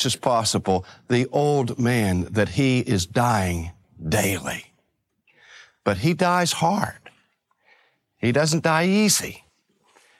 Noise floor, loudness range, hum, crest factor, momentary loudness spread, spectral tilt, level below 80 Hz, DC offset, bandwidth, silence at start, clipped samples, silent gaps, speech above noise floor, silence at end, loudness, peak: -71 dBFS; 3 LU; none; 20 dB; 9 LU; -4.5 dB/octave; -50 dBFS; under 0.1%; 16 kHz; 0 s; under 0.1%; none; 50 dB; 0.8 s; -22 LUFS; -4 dBFS